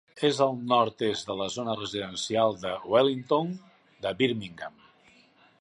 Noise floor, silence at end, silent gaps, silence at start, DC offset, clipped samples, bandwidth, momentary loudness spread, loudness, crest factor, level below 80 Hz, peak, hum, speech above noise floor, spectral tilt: -60 dBFS; 0.9 s; none; 0.15 s; under 0.1%; under 0.1%; 11.5 kHz; 12 LU; -28 LUFS; 20 dB; -66 dBFS; -8 dBFS; none; 33 dB; -4.5 dB/octave